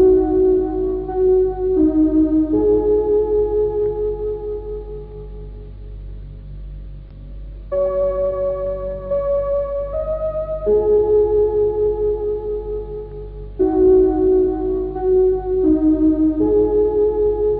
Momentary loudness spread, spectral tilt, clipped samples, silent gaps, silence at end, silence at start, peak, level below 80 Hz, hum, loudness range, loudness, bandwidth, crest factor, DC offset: 20 LU; -14 dB/octave; under 0.1%; none; 0 s; 0 s; -6 dBFS; -32 dBFS; none; 10 LU; -18 LUFS; 2.5 kHz; 12 dB; under 0.1%